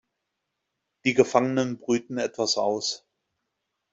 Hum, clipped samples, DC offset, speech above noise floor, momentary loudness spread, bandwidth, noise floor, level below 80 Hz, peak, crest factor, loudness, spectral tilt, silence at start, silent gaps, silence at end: none; under 0.1%; under 0.1%; 57 dB; 9 LU; 8 kHz; -81 dBFS; -70 dBFS; -4 dBFS; 24 dB; -25 LUFS; -4 dB/octave; 1.05 s; none; 0.95 s